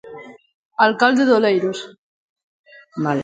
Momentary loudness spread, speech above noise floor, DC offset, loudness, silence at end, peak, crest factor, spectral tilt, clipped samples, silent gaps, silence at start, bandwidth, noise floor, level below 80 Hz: 24 LU; 22 dB; under 0.1%; -17 LUFS; 0 s; 0 dBFS; 20 dB; -5.5 dB/octave; under 0.1%; 0.54-0.71 s, 1.98-2.36 s, 2.43-2.64 s; 0.05 s; 9.2 kHz; -39 dBFS; -66 dBFS